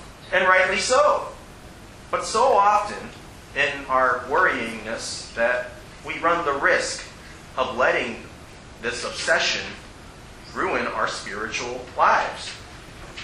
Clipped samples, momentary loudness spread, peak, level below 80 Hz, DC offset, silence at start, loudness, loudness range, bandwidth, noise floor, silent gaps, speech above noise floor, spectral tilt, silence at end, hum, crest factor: under 0.1%; 23 LU; -4 dBFS; -48 dBFS; under 0.1%; 0 s; -22 LUFS; 4 LU; 12.5 kHz; -43 dBFS; none; 20 dB; -2.5 dB/octave; 0 s; none; 20 dB